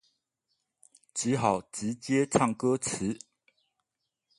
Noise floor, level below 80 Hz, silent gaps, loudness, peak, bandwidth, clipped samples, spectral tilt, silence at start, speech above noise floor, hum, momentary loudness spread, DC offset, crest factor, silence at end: -85 dBFS; -64 dBFS; none; -29 LUFS; -8 dBFS; 11.5 kHz; under 0.1%; -5 dB/octave; 1.15 s; 56 dB; none; 9 LU; under 0.1%; 24 dB; 1.2 s